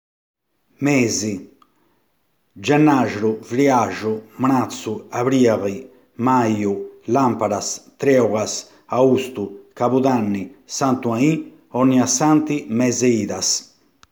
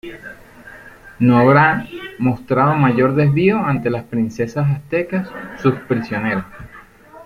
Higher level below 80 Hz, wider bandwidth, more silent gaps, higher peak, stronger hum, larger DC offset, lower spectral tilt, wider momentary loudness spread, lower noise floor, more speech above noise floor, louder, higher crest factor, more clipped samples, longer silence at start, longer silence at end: second, -64 dBFS vs -48 dBFS; first, over 20 kHz vs 7 kHz; neither; about the same, -2 dBFS vs -2 dBFS; neither; neither; second, -5 dB/octave vs -8.5 dB/octave; second, 11 LU vs 17 LU; first, -67 dBFS vs -42 dBFS; first, 49 dB vs 26 dB; about the same, -19 LUFS vs -17 LUFS; about the same, 18 dB vs 16 dB; neither; first, 0.8 s vs 0.05 s; first, 0.5 s vs 0.05 s